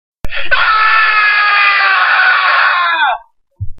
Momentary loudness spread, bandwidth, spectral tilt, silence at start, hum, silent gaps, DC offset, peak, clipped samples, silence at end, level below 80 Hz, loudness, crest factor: 12 LU; 13.5 kHz; -3.5 dB/octave; 0.25 s; none; none; under 0.1%; 0 dBFS; under 0.1%; 0 s; -34 dBFS; -9 LUFS; 12 dB